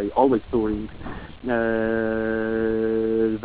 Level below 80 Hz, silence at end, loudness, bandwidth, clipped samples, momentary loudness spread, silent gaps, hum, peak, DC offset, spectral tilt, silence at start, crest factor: -44 dBFS; 0 s; -23 LUFS; 4 kHz; under 0.1%; 13 LU; none; none; -6 dBFS; 0.3%; -11 dB/octave; 0 s; 16 dB